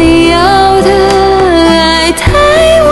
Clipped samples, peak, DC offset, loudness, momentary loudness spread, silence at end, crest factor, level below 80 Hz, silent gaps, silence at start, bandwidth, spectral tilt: 2%; 0 dBFS; under 0.1%; -6 LUFS; 2 LU; 0 s; 6 dB; -20 dBFS; none; 0 s; 12.5 kHz; -4.5 dB/octave